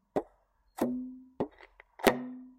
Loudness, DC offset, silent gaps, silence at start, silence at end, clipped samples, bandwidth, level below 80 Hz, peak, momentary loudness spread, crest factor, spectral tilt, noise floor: -34 LUFS; under 0.1%; none; 0.15 s; 0.05 s; under 0.1%; 16 kHz; -62 dBFS; -6 dBFS; 13 LU; 30 dB; -4.5 dB/octave; -69 dBFS